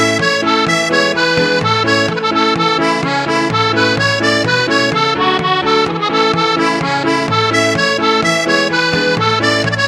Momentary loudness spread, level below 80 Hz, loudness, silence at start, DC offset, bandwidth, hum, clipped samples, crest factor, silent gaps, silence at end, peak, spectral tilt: 2 LU; -48 dBFS; -13 LUFS; 0 s; under 0.1%; 15 kHz; none; under 0.1%; 14 dB; none; 0 s; 0 dBFS; -4 dB/octave